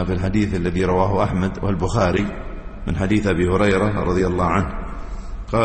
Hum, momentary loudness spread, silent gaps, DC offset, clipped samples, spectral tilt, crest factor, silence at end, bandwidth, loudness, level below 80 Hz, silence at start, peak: none; 15 LU; none; under 0.1%; under 0.1%; -7 dB/octave; 16 dB; 0 s; 8.8 kHz; -20 LUFS; -30 dBFS; 0 s; -4 dBFS